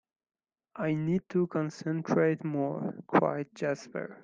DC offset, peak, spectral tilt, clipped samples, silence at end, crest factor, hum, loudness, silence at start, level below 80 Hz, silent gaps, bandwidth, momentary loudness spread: under 0.1%; -10 dBFS; -8 dB/octave; under 0.1%; 0.05 s; 22 dB; none; -31 LUFS; 0.75 s; -72 dBFS; none; 7.6 kHz; 9 LU